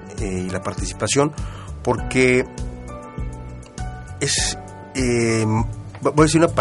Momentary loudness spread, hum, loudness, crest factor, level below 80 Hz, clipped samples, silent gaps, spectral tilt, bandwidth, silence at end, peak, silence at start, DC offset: 16 LU; none; -20 LUFS; 18 dB; -34 dBFS; under 0.1%; none; -4.5 dB/octave; 11.5 kHz; 0 s; -2 dBFS; 0 s; under 0.1%